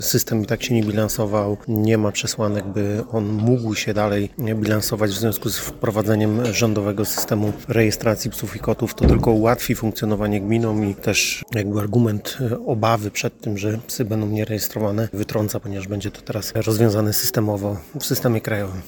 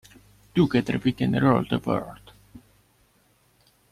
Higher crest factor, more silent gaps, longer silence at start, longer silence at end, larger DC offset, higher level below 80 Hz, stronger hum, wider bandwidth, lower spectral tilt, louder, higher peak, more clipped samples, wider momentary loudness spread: about the same, 20 dB vs 20 dB; neither; second, 0 s vs 0.55 s; second, 0 s vs 1.35 s; neither; first, -38 dBFS vs -54 dBFS; neither; first, 19.5 kHz vs 14.5 kHz; second, -5.5 dB/octave vs -7.5 dB/octave; first, -21 LUFS vs -24 LUFS; first, -2 dBFS vs -8 dBFS; neither; about the same, 7 LU vs 8 LU